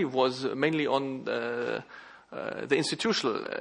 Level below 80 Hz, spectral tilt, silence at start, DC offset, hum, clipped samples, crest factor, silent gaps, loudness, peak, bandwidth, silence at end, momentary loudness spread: -76 dBFS; -4.5 dB/octave; 0 s; under 0.1%; none; under 0.1%; 20 dB; none; -29 LUFS; -10 dBFS; 10.5 kHz; 0 s; 11 LU